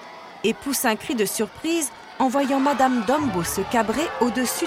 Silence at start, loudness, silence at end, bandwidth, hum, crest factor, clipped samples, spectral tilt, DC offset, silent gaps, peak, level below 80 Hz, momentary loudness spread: 0 s; -23 LUFS; 0 s; 17 kHz; none; 16 dB; under 0.1%; -3.5 dB/octave; under 0.1%; none; -6 dBFS; -52 dBFS; 6 LU